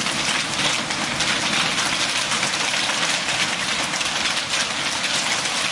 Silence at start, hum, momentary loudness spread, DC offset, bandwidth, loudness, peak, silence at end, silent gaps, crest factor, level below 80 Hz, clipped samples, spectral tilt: 0 s; none; 2 LU; under 0.1%; 11.5 kHz; -20 LUFS; -6 dBFS; 0 s; none; 16 dB; -54 dBFS; under 0.1%; -0.5 dB/octave